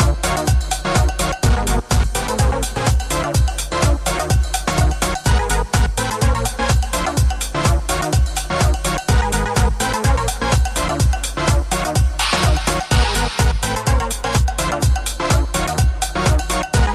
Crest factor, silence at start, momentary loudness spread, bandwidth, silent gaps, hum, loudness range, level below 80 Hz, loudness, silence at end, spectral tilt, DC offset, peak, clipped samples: 14 dB; 0 s; 2 LU; 15 kHz; none; none; 1 LU; -20 dBFS; -18 LUFS; 0 s; -4 dB/octave; under 0.1%; -2 dBFS; under 0.1%